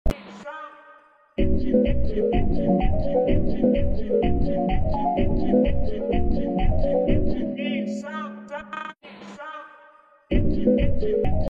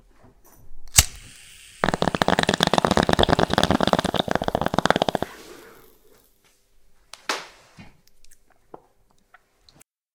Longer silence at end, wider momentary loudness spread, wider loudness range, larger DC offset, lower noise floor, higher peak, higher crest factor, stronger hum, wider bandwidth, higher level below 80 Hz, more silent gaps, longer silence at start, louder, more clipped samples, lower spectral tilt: second, 0.05 s vs 1.8 s; second, 16 LU vs 25 LU; second, 5 LU vs 17 LU; neither; second, -53 dBFS vs -60 dBFS; second, -8 dBFS vs 0 dBFS; second, 14 dB vs 26 dB; neither; second, 7 kHz vs 18 kHz; first, -28 dBFS vs -42 dBFS; neither; second, 0.05 s vs 0.65 s; second, -24 LUFS vs -21 LUFS; neither; first, -9 dB/octave vs -3.5 dB/octave